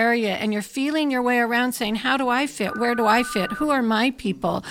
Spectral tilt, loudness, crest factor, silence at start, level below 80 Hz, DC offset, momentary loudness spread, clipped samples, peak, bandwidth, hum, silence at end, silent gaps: -4.5 dB/octave; -22 LUFS; 16 dB; 0 s; -54 dBFS; under 0.1%; 6 LU; under 0.1%; -6 dBFS; 17 kHz; none; 0 s; none